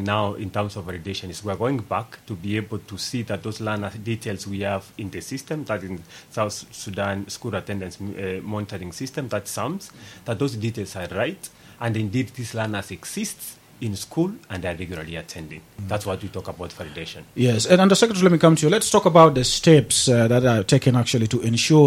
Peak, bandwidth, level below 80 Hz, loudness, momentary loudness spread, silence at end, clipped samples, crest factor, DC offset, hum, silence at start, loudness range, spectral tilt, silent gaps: 0 dBFS; 16.5 kHz; -52 dBFS; -22 LUFS; 18 LU; 0 s; under 0.1%; 22 dB; under 0.1%; none; 0 s; 13 LU; -5 dB/octave; none